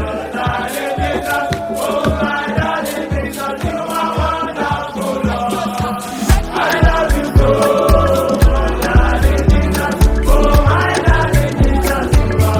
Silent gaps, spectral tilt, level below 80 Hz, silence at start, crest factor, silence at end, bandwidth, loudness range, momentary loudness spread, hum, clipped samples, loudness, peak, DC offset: none; -6 dB/octave; -18 dBFS; 0 s; 14 dB; 0 s; 18.5 kHz; 5 LU; 7 LU; none; under 0.1%; -15 LUFS; 0 dBFS; under 0.1%